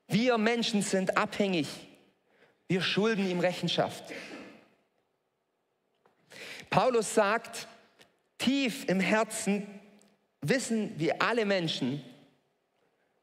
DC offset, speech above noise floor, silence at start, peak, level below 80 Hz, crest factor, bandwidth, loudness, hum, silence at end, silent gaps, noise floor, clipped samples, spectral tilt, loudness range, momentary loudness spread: under 0.1%; 50 dB; 0.1 s; -8 dBFS; -76 dBFS; 24 dB; 16 kHz; -29 LUFS; none; 1.1 s; none; -79 dBFS; under 0.1%; -4.5 dB/octave; 5 LU; 16 LU